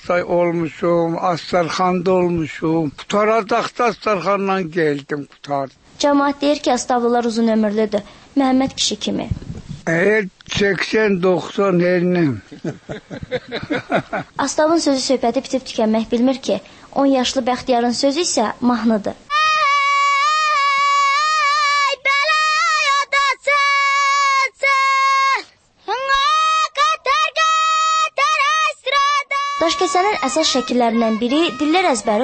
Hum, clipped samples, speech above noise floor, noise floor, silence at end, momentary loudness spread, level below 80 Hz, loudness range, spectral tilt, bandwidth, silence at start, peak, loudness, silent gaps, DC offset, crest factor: none; under 0.1%; 20 dB; -38 dBFS; 0 s; 10 LU; -50 dBFS; 5 LU; -4 dB/octave; 8.8 kHz; 0 s; -4 dBFS; -17 LUFS; none; under 0.1%; 12 dB